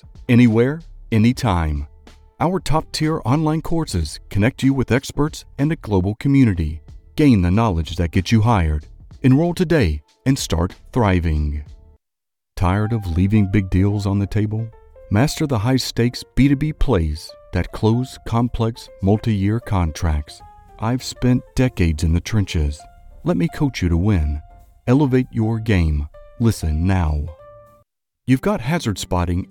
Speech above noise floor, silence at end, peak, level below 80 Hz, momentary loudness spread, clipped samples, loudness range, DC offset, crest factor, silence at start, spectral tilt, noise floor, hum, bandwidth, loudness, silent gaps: 68 dB; 0.05 s; -4 dBFS; -30 dBFS; 10 LU; under 0.1%; 3 LU; under 0.1%; 16 dB; 0.05 s; -7 dB/octave; -86 dBFS; none; 16.5 kHz; -19 LUFS; none